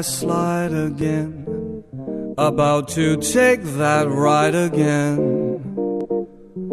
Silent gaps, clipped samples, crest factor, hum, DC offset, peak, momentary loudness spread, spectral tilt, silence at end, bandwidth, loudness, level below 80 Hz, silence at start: none; under 0.1%; 16 dB; none; under 0.1%; -4 dBFS; 13 LU; -5.5 dB/octave; 0 s; 12 kHz; -19 LUFS; -52 dBFS; 0 s